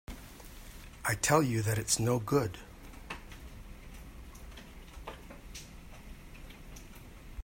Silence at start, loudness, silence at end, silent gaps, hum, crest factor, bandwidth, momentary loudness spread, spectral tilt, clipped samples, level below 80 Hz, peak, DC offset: 0.1 s; -31 LUFS; 0 s; none; none; 28 dB; 16.5 kHz; 23 LU; -4.5 dB/octave; under 0.1%; -50 dBFS; -8 dBFS; under 0.1%